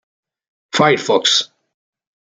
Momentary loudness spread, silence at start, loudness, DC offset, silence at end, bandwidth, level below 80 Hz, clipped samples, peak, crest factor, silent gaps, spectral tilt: 10 LU; 0.75 s; -15 LUFS; under 0.1%; 0.75 s; 9.6 kHz; -66 dBFS; under 0.1%; -2 dBFS; 18 dB; none; -3 dB/octave